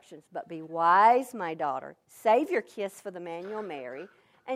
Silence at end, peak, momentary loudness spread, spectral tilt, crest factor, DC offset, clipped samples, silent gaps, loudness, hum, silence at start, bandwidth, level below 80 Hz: 0 s; -10 dBFS; 21 LU; -5 dB/octave; 20 dB; under 0.1%; under 0.1%; none; -27 LUFS; none; 0.1 s; 15.5 kHz; -84 dBFS